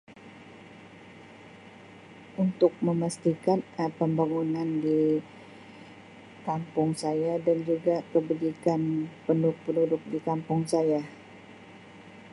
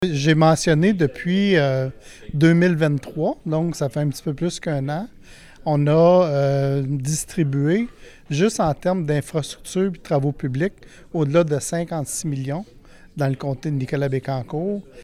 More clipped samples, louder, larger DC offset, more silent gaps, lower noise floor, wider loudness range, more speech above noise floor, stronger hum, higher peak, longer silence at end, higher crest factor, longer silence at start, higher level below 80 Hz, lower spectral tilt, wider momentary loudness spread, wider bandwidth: neither; second, -28 LUFS vs -21 LUFS; neither; neither; first, -49 dBFS vs -43 dBFS; about the same, 3 LU vs 5 LU; about the same, 22 dB vs 23 dB; neither; second, -10 dBFS vs -6 dBFS; about the same, 0.05 s vs 0 s; about the same, 20 dB vs 16 dB; about the same, 0.1 s vs 0 s; second, -72 dBFS vs -48 dBFS; first, -7.5 dB/octave vs -6 dB/octave; first, 23 LU vs 11 LU; second, 11.5 kHz vs 14.5 kHz